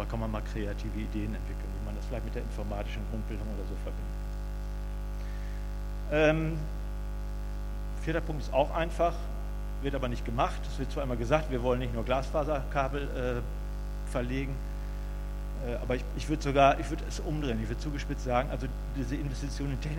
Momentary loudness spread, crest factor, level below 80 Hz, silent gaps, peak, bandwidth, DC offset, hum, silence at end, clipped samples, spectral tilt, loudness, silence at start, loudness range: 10 LU; 24 dB; -36 dBFS; none; -8 dBFS; 16 kHz; under 0.1%; 50 Hz at -35 dBFS; 0 s; under 0.1%; -6.5 dB/octave; -33 LUFS; 0 s; 7 LU